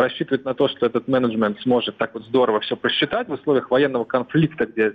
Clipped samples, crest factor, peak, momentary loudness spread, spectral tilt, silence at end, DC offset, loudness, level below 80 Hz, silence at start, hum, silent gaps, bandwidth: under 0.1%; 12 dB; -8 dBFS; 4 LU; -8 dB/octave; 0 s; under 0.1%; -21 LUFS; -60 dBFS; 0 s; none; none; 5 kHz